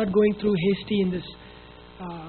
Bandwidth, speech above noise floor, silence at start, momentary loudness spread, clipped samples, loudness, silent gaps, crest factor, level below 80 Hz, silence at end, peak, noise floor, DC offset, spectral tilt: 4.5 kHz; 22 dB; 0 s; 21 LU; under 0.1%; -24 LUFS; none; 16 dB; -52 dBFS; 0 s; -10 dBFS; -46 dBFS; under 0.1%; -6 dB/octave